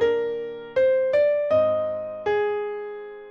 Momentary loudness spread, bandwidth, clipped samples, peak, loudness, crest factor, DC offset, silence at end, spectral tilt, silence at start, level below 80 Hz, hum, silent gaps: 12 LU; 6.6 kHz; under 0.1%; -12 dBFS; -23 LUFS; 12 dB; under 0.1%; 0 s; -6 dB/octave; 0 s; -60 dBFS; none; none